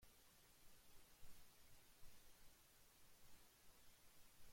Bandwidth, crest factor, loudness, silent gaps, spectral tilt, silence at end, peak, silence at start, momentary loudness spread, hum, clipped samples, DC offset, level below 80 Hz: 16.5 kHz; 16 dB; -69 LUFS; none; -2 dB/octave; 0 s; -46 dBFS; 0 s; 1 LU; none; under 0.1%; under 0.1%; -74 dBFS